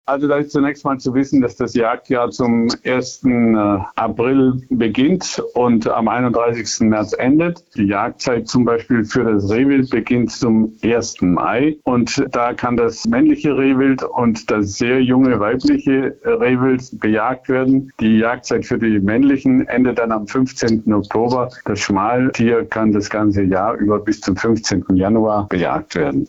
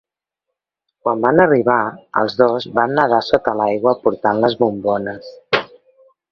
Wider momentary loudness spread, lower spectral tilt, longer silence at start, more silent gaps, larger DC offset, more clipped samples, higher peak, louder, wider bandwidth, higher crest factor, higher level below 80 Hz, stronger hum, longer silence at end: second, 5 LU vs 8 LU; about the same, -6 dB/octave vs -7 dB/octave; second, 0.1 s vs 1.05 s; neither; neither; neither; second, -6 dBFS vs 0 dBFS; about the same, -16 LUFS vs -17 LUFS; first, 8 kHz vs 6.8 kHz; second, 10 dB vs 18 dB; first, -46 dBFS vs -56 dBFS; neither; second, 0 s vs 0.65 s